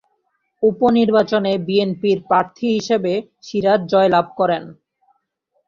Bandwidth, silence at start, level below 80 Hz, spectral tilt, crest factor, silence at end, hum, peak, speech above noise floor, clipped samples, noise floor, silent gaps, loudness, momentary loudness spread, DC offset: 7.4 kHz; 0.6 s; -60 dBFS; -6.5 dB/octave; 16 dB; 0.95 s; none; -2 dBFS; 52 dB; under 0.1%; -69 dBFS; none; -18 LUFS; 6 LU; under 0.1%